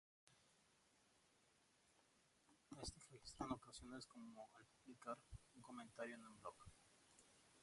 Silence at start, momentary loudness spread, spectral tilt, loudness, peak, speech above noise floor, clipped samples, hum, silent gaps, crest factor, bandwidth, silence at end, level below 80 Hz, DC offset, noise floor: 0.25 s; 13 LU; -4 dB/octave; -57 LUFS; -34 dBFS; 22 dB; under 0.1%; none; none; 26 dB; 11.5 kHz; 0 s; -74 dBFS; under 0.1%; -79 dBFS